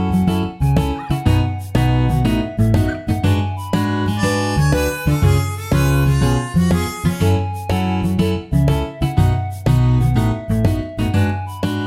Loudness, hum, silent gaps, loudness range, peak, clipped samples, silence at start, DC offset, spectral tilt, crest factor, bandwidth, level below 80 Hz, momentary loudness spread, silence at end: -18 LUFS; none; none; 1 LU; -2 dBFS; under 0.1%; 0 s; under 0.1%; -7 dB/octave; 14 dB; 16 kHz; -26 dBFS; 5 LU; 0 s